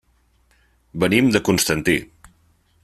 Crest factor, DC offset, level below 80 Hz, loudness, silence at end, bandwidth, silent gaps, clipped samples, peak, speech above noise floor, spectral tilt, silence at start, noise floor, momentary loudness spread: 20 dB; under 0.1%; -48 dBFS; -18 LUFS; 0.8 s; 15 kHz; none; under 0.1%; -2 dBFS; 42 dB; -4 dB/octave; 0.95 s; -60 dBFS; 7 LU